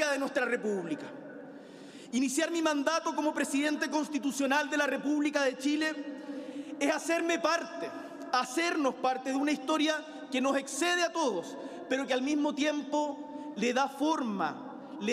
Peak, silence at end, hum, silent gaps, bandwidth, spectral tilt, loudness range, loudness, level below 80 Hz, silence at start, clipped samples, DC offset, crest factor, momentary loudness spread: -12 dBFS; 0 s; none; none; 15.5 kHz; -3 dB/octave; 2 LU; -31 LUFS; -80 dBFS; 0 s; under 0.1%; under 0.1%; 18 dB; 13 LU